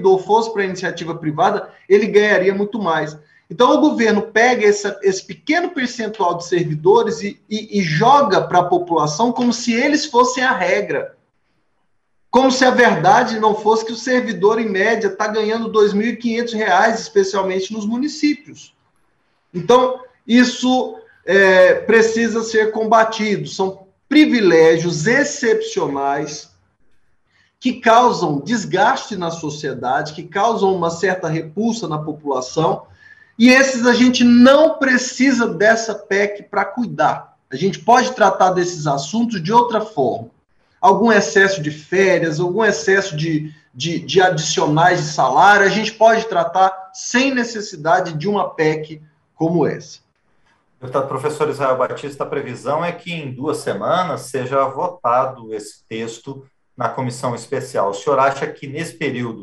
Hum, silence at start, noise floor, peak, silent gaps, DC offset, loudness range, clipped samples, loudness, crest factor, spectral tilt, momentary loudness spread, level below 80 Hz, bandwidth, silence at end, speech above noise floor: none; 0 s; -69 dBFS; -2 dBFS; none; under 0.1%; 7 LU; under 0.1%; -16 LUFS; 14 dB; -4.5 dB/octave; 12 LU; -60 dBFS; 12 kHz; 0 s; 53 dB